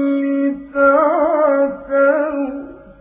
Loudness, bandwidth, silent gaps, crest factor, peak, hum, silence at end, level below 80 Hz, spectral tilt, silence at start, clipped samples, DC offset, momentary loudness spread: -16 LUFS; 3.6 kHz; none; 14 dB; -2 dBFS; none; 0.1 s; -52 dBFS; -9.5 dB/octave; 0 s; under 0.1%; under 0.1%; 11 LU